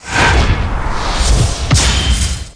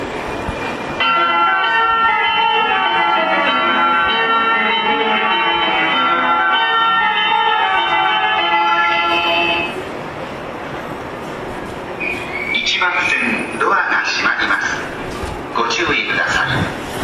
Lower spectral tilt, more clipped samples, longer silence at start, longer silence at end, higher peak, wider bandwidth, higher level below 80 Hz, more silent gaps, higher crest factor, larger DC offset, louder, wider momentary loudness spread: about the same, -3.5 dB/octave vs -3 dB/octave; neither; about the same, 0 s vs 0 s; about the same, 0.05 s vs 0 s; first, 0 dBFS vs -4 dBFS; second, 10.5 kHz vs 14 kHz; first, -16 dBFS vs -44 dBFS; neither; about the same, 12 dB vs 12 dB; neither; about the same, -14 LUFS vs -15 LUFS; second, 7 LU vs 13 LU